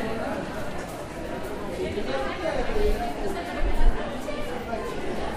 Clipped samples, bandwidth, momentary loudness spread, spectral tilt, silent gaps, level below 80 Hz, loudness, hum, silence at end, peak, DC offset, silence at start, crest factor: under 0.1%; 14.5 kHz; 7 LU; -5.5 dB/octave; none; -30 dBFS; -30 LUFS; none; 0 s; -8 dBFS; under 0.1%; 0 s; 18 dB